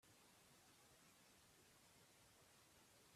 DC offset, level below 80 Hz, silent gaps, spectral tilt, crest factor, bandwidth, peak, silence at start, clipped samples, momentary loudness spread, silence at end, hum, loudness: under 0.1%; -90 dBFS; none; -2.5 dB/octave; 14 dB; 14.5 kHz; -58 dBFS; 0 s; under 0.1%; 0 LU; 0 s; none; -70 LUFS